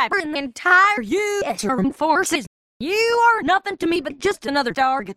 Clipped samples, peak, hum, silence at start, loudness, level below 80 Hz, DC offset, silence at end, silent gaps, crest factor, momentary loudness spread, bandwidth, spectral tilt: under 0.1%; -4 dBFS; none; 0 s; -19 LUFS; -54 dBFS; under 0.1%; 0.05 s; 2.47-2.80 s; 16 dB; 9 LU; 16 kHz; -3.5 dB/octave